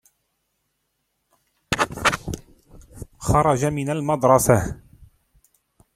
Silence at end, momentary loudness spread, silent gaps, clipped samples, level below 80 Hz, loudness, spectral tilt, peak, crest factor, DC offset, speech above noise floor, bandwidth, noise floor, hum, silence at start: 0.9 s; 19 LU; none; under 0.1%; -42 dBFS; -21 LUFS; -5 dB/octave; 0 dBFS; 24 dB; under 0.1%; 55 dB; 16.5 kHz; -74 dBFS; none; 1.7 s